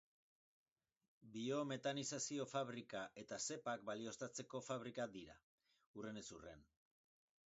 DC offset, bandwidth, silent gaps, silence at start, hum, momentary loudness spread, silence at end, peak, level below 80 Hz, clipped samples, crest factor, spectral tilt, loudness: under 0.1%; 8 kHz; 5.43-5.58 s, 5.87-5.94 s; 1.2 s; none; 14 LU; 0.85 s; -30 dBFS; -82 dBFS; under 0.1%; 20 dB; -4 dB/octave; -48 LUFS